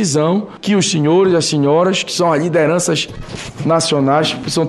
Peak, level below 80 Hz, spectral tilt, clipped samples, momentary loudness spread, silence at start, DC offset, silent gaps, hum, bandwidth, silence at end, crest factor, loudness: -2 dBFS; -44 dBFS; -4.5 dB/octave; under 0.1%; 7 LU; 0 s; under 0.1%; none; none; 12.5 kHz; 0 s; 12 dB; -14 LUFS